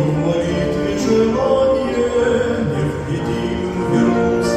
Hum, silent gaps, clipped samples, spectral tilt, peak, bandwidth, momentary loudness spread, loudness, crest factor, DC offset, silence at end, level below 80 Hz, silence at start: none; none; under 0.1%; -6.5 dB/octave; -4 dBFS; 13 kHz; 6 LU; -17 LUFS; 14 dB; under 0.1%; 0 s; -38 dBFS; 0 s